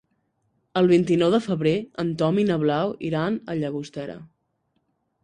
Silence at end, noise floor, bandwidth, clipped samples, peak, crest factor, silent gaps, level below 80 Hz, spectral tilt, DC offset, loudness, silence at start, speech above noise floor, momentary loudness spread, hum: 1 s; -72 dBFS; 10 kHz; under 0.1%; -6 dBFS; 16 dB; none; -62 dBFS; -7.5 dB/octave; under 0.1%; -23 LUFS; 0.75 s; 50 dB; 14 LU; none